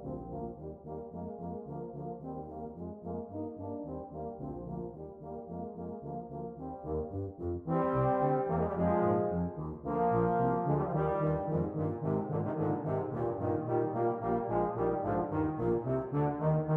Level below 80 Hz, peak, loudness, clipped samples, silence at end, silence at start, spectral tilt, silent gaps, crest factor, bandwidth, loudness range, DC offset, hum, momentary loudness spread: -54 dBFS; -18 dBFS; -34 LUFS; under 0.1%; 0 s; 0 s; -12 dB/octave; none; 16 dB; 3.6 kHz; 11 LU; under 0.1%; none; 13 LU